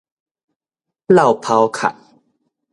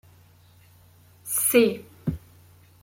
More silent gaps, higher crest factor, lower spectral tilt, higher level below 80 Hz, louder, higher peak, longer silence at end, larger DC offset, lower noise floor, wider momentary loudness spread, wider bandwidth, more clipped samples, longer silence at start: neither; about the same, 18 dB vs 22 dB; first, -6 dB/octave vs -4 dB/octave; second, -62 dBFS vs -54 dBFS; first, -15 LUFS vs -23 LUFS; first, 0 dBFS vs -6 dBFS; first, 0.8 s vs 0.65 s; neither; first, -83 dBFS vs -55 dBFS; second, 9 LU vs 20 LU; second, 11.5 kHz vs 16.5 kHz; neither; second, 1.1 s vs 1.25 s